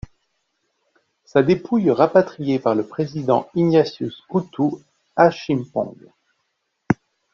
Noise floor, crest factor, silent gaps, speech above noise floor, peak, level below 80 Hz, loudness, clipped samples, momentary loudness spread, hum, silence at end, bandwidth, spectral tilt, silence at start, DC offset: -73 dBFS; 20 dB; none; 54 dB; -2 dBFS; -56 dBFS; -20 LUFS; under 0.1%; 10 LU; none; 0.4 s; 7.2 kHz; -6.5 dB/octave; 1.35 s; under 0.1%